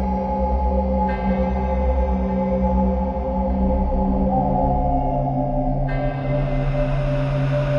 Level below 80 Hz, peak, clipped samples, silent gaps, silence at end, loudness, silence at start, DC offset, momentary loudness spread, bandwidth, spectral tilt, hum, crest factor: -24 dBFS; -8 dBFS; under 0.1%; none; 0 s; -21 LUFS; 0 s; under 0.1%; 3 LU; 6 kHz; -10 dB/octave; none; 12 dB